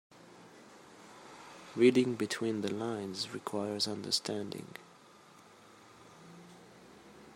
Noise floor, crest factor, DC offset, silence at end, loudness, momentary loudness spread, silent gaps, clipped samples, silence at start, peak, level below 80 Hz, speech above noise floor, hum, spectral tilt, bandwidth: -58 dBFS; 24 dB; under 0.1%; 0 s; -33 LUFS; 28 LU; none; under 0.1%; 0.15 s; -14 dBFS; -80 dBFS; 26 dB; none; -4.5 dB/octave; 16 kHz